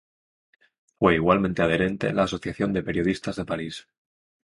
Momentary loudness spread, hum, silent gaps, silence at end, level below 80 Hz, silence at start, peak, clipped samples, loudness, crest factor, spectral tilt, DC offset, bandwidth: 10 LU; none; none; 0.75 s; -48 dBFS; 1 s; -6 dBFS; under 0.1%; -24 LUFS; 20 dB; -6.5 dB/octave; under 0.1%; 11.5 kHz